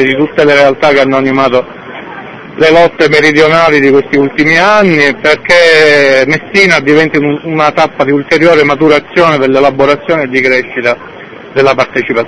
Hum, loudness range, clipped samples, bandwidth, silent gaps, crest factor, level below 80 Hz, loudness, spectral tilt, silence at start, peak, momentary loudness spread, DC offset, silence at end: none; 3 LU; 4%; 11 kHz; none; 8 dB; -42 dBFS; -7 LUFS; -5 dB/octave; 0 s; 0 dBFS; 8 LU; 1%; 0 s